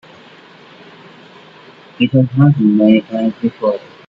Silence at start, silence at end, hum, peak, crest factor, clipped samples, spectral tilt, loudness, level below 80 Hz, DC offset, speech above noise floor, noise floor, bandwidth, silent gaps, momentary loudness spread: 2 s; 0.3 s; none; 0 dBFS; 16 dB; under 0.1%; -10 dB/octave; -14 LUFS; -56 dBFS; under 0.1%; 29 dB; -41 dBFS; 5.2 kHz; none; 8 LU